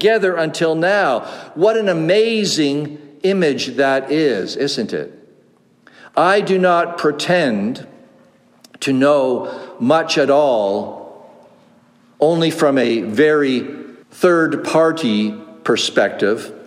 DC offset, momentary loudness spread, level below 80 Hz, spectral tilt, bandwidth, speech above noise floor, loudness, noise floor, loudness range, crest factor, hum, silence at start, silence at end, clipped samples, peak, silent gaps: under 0.1%; 10 LU; -70 dBFS; -5 dB/octave; 15.5 kHz; 37 dB; -16 LUFS; -53 dBFS; 2 LU; 16 dB; none; 0 s; 0 s; under 0.1%; -2 dBFS; none